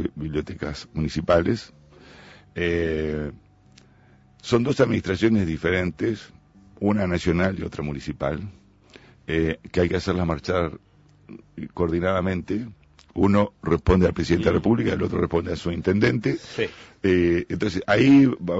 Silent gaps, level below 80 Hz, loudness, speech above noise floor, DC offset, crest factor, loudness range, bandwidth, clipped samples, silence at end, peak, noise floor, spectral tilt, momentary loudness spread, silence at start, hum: none; -42 dBFS; -23 LUFS; 32 dB; under 0.1%; 16 dB; 5 LU; 8 kHz; under 0.1%; 0 s; -6 dBFS; -54 dBFS; -7 dB/octave; 11 LU; 0 s; none